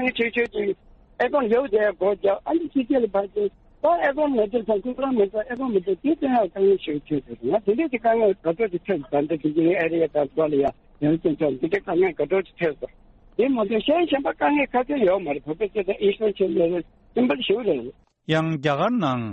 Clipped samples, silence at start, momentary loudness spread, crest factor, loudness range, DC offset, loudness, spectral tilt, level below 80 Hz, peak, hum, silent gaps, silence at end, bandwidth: under 0.1%; 0 s; 6 LU; 14 dB; 1 LU; under 0.1%; -23 LUFS; -4.5 dB/octave; -54 dBFS; -8 dBFS; none; none; 0 s; 7 kHz